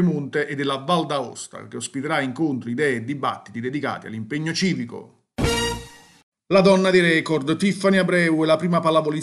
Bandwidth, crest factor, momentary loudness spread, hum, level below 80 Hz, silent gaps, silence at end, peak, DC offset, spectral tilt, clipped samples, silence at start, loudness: 13 kHz; 18 dB; 15 LU; none; -46 dBFS; 6.23-6.32 s; 0 s; -4 dBFS; under 0.1%; -5.5 dB/octave; under 0.1%; 0 s; -21 LUFS